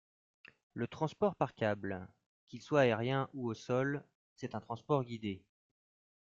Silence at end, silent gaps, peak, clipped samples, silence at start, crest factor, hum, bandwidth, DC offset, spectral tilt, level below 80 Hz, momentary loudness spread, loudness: 1 s; 2.26-2.47 s, 4.15-4.36 s; -16 dBFS; under 0.1%; 0.75 s; 22 dB; none; 7.6 kHz; under 0.1%; -7 dB/octave; -74 dBFS; 17 LU; -36 LUFS